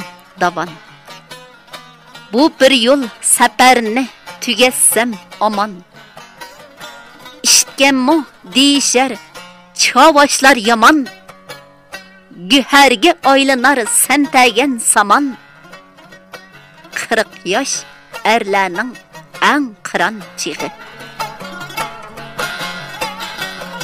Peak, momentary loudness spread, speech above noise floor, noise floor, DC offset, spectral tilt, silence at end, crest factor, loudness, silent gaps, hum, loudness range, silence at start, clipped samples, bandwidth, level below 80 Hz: 0 dBFS; 21 LU; 29 dB; -41 dBFS; under 0.1%; -1.5 dB/octave; 0 s; 14 dB; -12 LUFS; none; none; 8 LU; 0 s; under 0.1%; 16 kHz; -54 dBFS